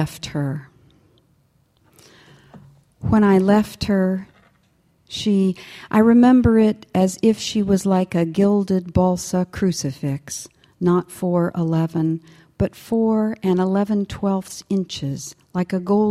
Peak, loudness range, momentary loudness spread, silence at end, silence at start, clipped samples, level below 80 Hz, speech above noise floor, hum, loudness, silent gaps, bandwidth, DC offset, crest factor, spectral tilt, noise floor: -4 dBFS; 5 LU; 13 LU; 0 s; 0 s; under 0.1%; -44 dBFS; 42 dB; none; -20 LUFS; none; 14.5 kHz; under 0.1%; 16 dB; -6.5 dB/octave; -61 dBFS